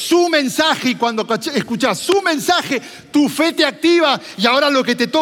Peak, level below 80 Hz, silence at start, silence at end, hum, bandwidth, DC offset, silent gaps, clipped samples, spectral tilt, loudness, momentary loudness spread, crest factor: 0 dBFS; -66 dBFS; 0 s; 0 s; none; 17 kHz; under 0.1%; none; under 0.1%; -3 dB/octave; -16 LUFS; 6 LU; 14 dB